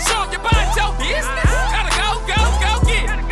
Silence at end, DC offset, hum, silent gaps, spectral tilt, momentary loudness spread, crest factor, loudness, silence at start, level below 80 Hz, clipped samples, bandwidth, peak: 0 s; under 0.1%; none; none; -3.5 dB/octave; 3 LU; 14 dB; -18 LUFS; 0 s; -20 dBFS; under 0.1%; 13 kHz; -2 dBFS